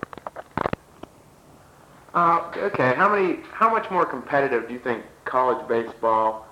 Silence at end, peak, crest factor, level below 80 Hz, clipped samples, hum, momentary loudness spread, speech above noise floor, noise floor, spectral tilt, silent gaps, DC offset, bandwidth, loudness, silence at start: 0.05 s; -8 dBFS; 16 dB; -58 dBFS; under 0.1%; none; 10 LU; 29 dB; -51 dBFS; -7 dB/octave; none; under 0.1%; 15.5 kHz; -23 LUFS; 0.25 s